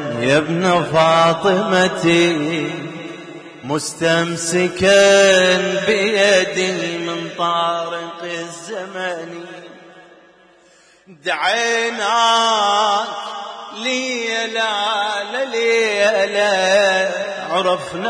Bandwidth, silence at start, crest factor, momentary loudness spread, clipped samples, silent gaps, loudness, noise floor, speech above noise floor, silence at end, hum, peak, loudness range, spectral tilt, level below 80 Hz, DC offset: 11 kHz; 0 s; 14 dB; 15 LU; under 0.1%; none; -16 LUFS; -51 dBFS; 34 dB; 0 s; none; -4 dBFS; 10 LU; -3.5 dB/octave; -56 dBFS; under 0.1%